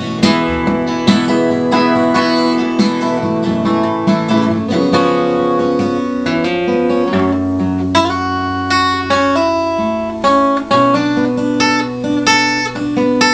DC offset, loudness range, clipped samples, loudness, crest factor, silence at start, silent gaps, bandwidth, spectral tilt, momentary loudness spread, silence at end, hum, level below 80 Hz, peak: under 0.1%; 1 LU; under 0.1%; -14 LUFS; 14 dB; 0 s; none; 9.6 kHz; -5 dB/octave; 4 LU; 0 s; none; -44 dBFS; 0 dBFS